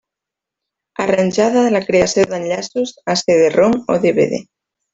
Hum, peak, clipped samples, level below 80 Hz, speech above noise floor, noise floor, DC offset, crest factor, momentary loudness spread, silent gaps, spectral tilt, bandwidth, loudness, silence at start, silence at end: none; -2 dBFS; under 0.1%; -52 dBFS; 69 dB; -84 dBFS; under 0.1%; 14 dB; 9 LU; none; -4.5 dB/octave; 8 kHz; -15 LUFS; 1 s; 0.5 s